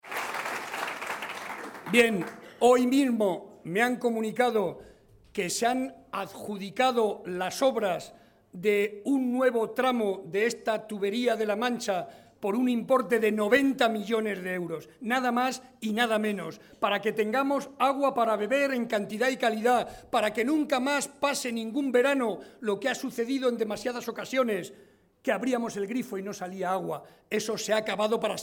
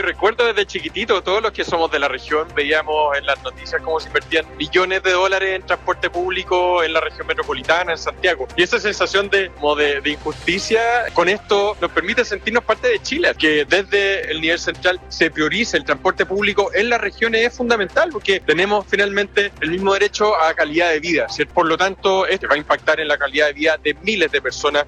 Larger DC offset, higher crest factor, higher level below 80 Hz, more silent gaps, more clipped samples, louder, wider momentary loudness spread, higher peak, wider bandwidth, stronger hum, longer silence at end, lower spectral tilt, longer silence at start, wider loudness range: neither; about the same, 20 dB vs 16 dB; second, -68 dBFS vs -42 dBFS; neither; neither; second, -28 LUFS vs -18 LUFS; first, 11 LU vs 4 LU; second, -8 dBFS vs -2 dBFS; first, 17 kHz vs 11 kHz; neither; about the same, 0 s vs 0 s; about the same, -4 dB/octave vs -3.5 dB/octave; about the same, 0.05 s vs 0 s; about the same, 4 LU vs 2 LU